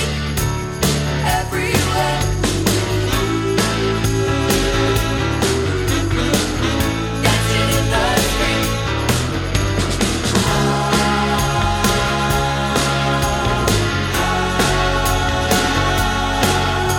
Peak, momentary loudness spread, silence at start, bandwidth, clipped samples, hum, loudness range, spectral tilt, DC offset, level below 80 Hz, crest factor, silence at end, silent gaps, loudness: 0 dBFS; 3 LU; 0 s; 17 kHz; under 0.1%; none; 1 LU; -4.5 dB/octave; under 0.1%; -26 dBFS; 16 dB; 0 s; none; -17 LUFS